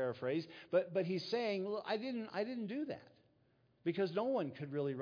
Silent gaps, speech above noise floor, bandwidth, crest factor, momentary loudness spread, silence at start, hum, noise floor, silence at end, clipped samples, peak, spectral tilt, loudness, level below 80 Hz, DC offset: none; 35 dB; 5.2 kHz; 18 dB; 6 LU; 0 s; none; -74 dBFS; 0 s; under 0.1%; -20 dBFS; -5 dB/octave; -39 LUFS; -86 dBFS; under 0.1%